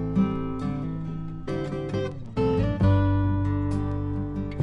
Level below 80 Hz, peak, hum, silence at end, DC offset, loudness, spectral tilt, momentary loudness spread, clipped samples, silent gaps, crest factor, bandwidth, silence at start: -38 dBFS; -10 dBFS; none; 0 s; under 0.1%; -27 LUFS; -9.5 dB/octave; 10 LU; under 0.1%; none; 16 dB; 6.2 kHz; 0 s